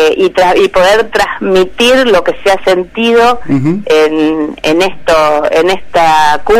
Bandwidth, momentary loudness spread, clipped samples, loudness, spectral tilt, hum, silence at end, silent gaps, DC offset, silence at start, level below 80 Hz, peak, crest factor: 16 kHz; 5 LU; under 0.1%; -9 LUFS; -4.5 dB/octave; none; 0 s; none; under 0.1%; 0 s; -36 dBFS; -2 dBFS; 8 dB